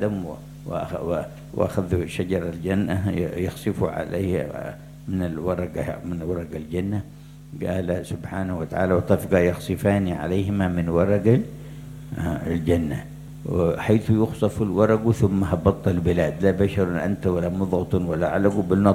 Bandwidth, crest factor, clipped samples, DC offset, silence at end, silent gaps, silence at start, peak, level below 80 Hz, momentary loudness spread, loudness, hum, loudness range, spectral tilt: 16.5 kHz; 22 dB; under 0.1%; under 0.1%; 0 s; none; 0 s; -2 dBFS; -46 dBFS; 12 LU; -24 LUFS; none; 7 LU; -8 dB/octave